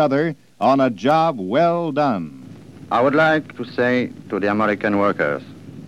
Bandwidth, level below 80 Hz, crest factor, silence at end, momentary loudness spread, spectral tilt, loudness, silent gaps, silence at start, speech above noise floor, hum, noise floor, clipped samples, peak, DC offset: 11.5 kHz; -62 dBFS; 16 dB; 0 s; 9 LU; -7 dB/octave; -19 LUFS; none; 0 s; 21 dB; none; -39 dBFS; under 0.1%; -4 dBFS; 0.2%